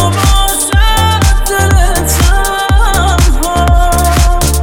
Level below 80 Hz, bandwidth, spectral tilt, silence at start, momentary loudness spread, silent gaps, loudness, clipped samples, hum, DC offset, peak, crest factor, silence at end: -10 dBFS; over 20 kHz; -4 dB/octave; 0 s; 2 LU; none; -10 LUFS; under 0.1%; none; under 0.1%; 0 dBFS; 8 dB; 0 s